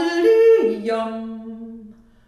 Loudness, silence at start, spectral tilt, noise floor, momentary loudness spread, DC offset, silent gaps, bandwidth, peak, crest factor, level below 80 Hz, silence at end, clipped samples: -17 LUFS; 0 s; -5.5 dB/octave; -44 dBFS; 22 LU; under 0.1%; none; 10 kHz; -6 dBFS; 14 dB; -60 dBFS; 0.35 s; under 0.1%